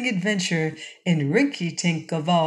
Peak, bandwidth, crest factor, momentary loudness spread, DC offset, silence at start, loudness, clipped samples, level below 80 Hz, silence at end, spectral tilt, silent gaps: -6 dBFS; 10.5 kHz; 18 dB; 5 LU; under 0.1%; 0 s; -24 LUFS; under 0.1%; -74 dBFS; 0 s; -5 dB/octave; none